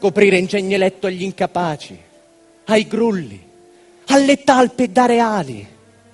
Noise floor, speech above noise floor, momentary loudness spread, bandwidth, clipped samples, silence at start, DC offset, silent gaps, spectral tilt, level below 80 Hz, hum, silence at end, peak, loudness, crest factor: -50 dBFS; 34 dB; 18 LU; 11.5 kHz; under 0.1%; 0 s; under 0.1%; none; -5 dB/octave; -58 dBFS; none; 0.5 s; 0 dBFS; -16 LUFS; 18 dB